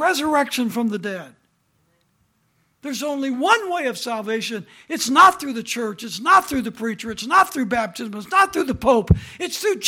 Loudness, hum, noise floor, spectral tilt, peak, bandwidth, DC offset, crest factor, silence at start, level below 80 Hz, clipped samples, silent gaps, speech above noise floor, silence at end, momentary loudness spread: -20 LUFS; none; -65 dBFS; -4 dB/octave; -2 dBFS; 17.5 kHz; under 0.1%; 20 dB; 0 s; -42 dBFS; under 0.1%; none; 45 dB; 0 s; 13 LU